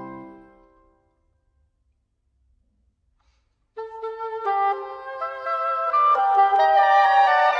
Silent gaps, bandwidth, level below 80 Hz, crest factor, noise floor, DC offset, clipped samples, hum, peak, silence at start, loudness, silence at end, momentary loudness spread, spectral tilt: none; 6.6 kHz; -66 dBFS; 16 dB; -70 dBFS; under 0.1%; under 0.1%; none; -6 dBFS; 0 s; -20 LUFS; 0 s; 19 LU; -3 dB/octave